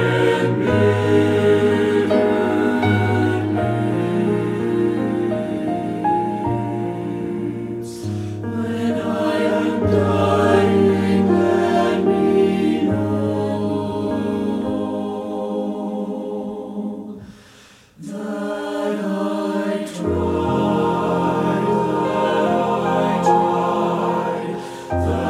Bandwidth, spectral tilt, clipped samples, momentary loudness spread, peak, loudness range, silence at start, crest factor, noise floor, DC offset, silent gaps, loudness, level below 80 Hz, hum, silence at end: 14.5 kHz; -7.5 dB/octave; under 0.1%; 10 LU; -2 dBFS; 9 LU; 0 s; 16 dB; -47 dBFS; under 0.1%; none; -19 LUFS; -48 dBFS; none; 0 s